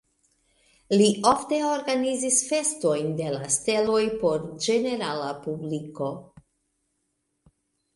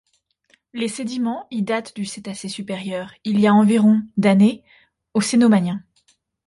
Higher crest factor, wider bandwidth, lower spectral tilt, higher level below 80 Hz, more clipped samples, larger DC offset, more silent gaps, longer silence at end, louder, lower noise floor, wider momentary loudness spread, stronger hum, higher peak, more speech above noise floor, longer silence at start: first, 22 dB vs 14 dB; about the same, 11.5 kHz vs 11.5 kHz; second, -3.5 dB/octave vs -6 dB/octave; about the same, -62 dBFS vs -62 dBFS; neither; neither; neither; first, 1.7 s vs 0.7 s; second, -25 LUFS vs -19 LUFS; first, -76 dBFS vs -63 dBFS; second, 11 LU vs 15 LU; neither; about the same, -4 dBFS vs -6 dBFS; first, 51 dB vs 44 dB; first, 0.9 s vs 0.75 s